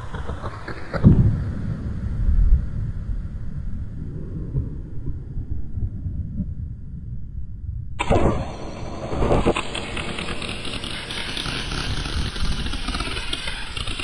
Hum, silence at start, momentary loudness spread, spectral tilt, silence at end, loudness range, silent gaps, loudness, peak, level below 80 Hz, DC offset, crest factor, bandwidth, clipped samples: none; 0 s; 13 LU; -6 dB/octave; 0 s; 9 LU; none; -26 LUFS; -2 dBFS; -28 dBFS; under 0.1%; 22 dB; 11.5 kHz; under 0.1%